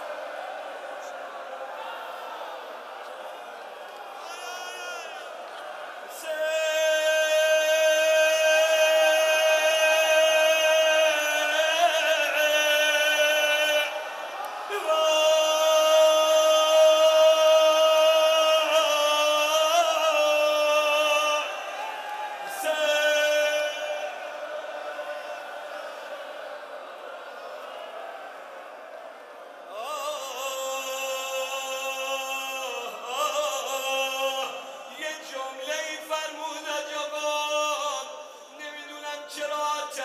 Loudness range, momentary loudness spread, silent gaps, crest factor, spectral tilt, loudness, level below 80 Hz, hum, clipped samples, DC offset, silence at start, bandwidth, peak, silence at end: 18 LU; 19 LU; none; 16 dB; 2 dB/octave; -23 LUFS; under -90 dBFS; none; under 0.1%; under 0.1%; 0 s; 15.5 kHz; -10 dBFS; 0 s